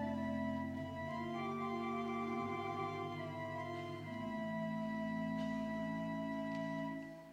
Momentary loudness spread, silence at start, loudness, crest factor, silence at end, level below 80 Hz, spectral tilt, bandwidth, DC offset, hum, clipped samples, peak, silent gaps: 4 LU; 0 s; -42 LUFS; 12 dB; 0 s; -70 dBFS; -7 dB/octave; 12.5 kHz; under 0.1%; none; under 0.1%; -30 dBFS; none